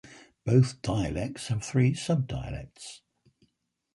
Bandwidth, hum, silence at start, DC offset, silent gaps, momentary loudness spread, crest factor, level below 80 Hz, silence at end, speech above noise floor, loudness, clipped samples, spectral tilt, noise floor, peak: 11.5 kHz; none; 0.05 s; under 0.1%; none; 17 LU; 20 dB; -48 dBFS; 1 s; 47 dB; -28 LUFS; under 0.1%; -6.5 dB/octave; -74 dBFS; -10 dBFS